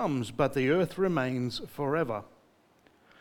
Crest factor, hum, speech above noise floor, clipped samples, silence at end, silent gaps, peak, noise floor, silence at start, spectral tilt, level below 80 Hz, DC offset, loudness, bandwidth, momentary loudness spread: 18 dB; none; 34 dB; under 0.1%; 0.95 s; none; -12 dBFS; -63 dBFS; 0 s; -6.5 dB/octave; -60 dBFS; under 0.1%; -30 LUFS; 18.5 kHz; 7 LU